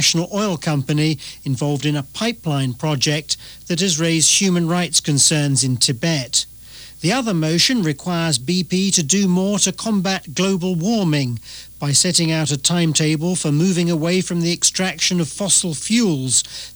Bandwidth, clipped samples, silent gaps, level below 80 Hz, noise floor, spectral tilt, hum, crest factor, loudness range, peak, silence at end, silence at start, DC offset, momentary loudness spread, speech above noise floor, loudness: over 20 kHz; under 0.1%; none; -52 dBFS; -39 dBFS; -3.5 dB/octave; none; 14 dB; 3 LU; -4 dBFS; 0 s; 0 s; 0.1%; 8 LU; 21 dB; -17 LUFS